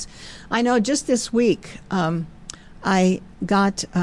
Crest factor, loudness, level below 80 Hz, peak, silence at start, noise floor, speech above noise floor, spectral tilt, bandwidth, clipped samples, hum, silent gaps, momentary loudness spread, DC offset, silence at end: 14 dB; -21 LUFS; -48 dBFS; -8 dBFS; 0 s; -40 dBFS; 20 dB; -5 dB/octave; 12 kHz; under 0.1%; none; none; 16 LU; 0.3%; 0 s